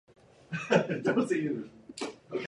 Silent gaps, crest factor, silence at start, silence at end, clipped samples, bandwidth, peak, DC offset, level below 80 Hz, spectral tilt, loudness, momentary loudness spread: none; 22 dB; 0.5 s; 0 s; under 0.1%; 11.5 kHz; -10 dBFS; under 0.1%; -70 dBFS; -6 dB/octave; -31 LUFS; 13 LU